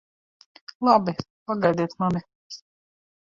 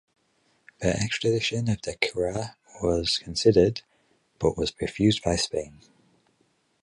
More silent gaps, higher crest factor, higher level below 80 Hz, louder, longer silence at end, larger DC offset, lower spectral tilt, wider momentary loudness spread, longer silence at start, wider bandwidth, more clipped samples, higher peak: first, 1.30-1.46 s, 2.35-2.50 s vs none; about the same, 20 dB vs 22 dB; second, -60 dBFS vs -46 dBFS; about the same, -24 LUFS vs -25 LUFS; second, 0.7 s vs 1.15 s; neither; first, -7 dB/octave vs -5 dB/octave; first, 22 LU vs 10 LU; about the same, 0.8 s vs 0.8 s; second, 7.4 kHz vs 11.5 kHz; neither; about the same, -6 dBFS vs -4 dBFS